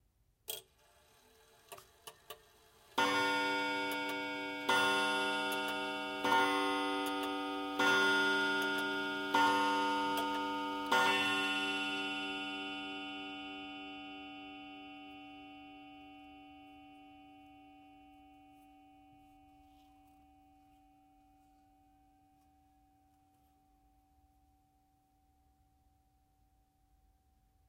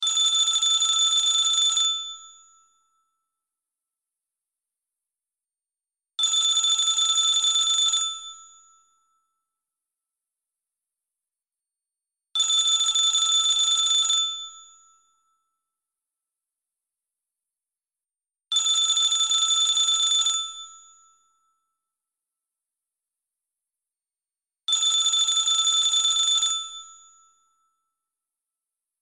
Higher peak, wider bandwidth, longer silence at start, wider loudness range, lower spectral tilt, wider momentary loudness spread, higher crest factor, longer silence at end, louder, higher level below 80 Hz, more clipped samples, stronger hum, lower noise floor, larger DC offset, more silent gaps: second, -16 dBFS vs -12 dBFS; first, 16 kHz vs 13.5 kHz; first, 0.5 s vs 0 s; first, 19 LU vs 9 LU; first, -2.5 dB/octave vs 6 dB/octave; first, 24 LU vs 11 LU; first, 22 dB vs 16 dB; first, 9.4 s vs 2.1 s; second, -34 LUFS vs -19 LUFS; about the same, -74 dBFS vs -76 dBFS; neither; neither; second, -73 dBFS vs under -90 dBFS; neither; neither